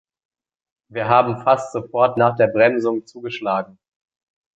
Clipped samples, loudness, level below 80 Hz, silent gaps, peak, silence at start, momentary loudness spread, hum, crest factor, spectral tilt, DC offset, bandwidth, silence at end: under 0.1%; -18 LUFS; -62 dBFS; none; -2 dBFS; 0.9 s; 11 LU; none; 18 dB; -6.5 dB/octave; under 0.1%; 8 kHz; 0.9 s